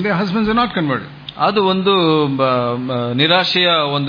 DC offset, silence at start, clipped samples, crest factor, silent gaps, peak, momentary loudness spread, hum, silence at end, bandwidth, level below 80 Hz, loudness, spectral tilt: under 0.1%; 0 s; under 0.1%; 14 dB; none; -2 dBFS; 7 LU; none; 0 s; 5.2 kHz; -48 dBFS; -15 LUFS; -7 dB/octave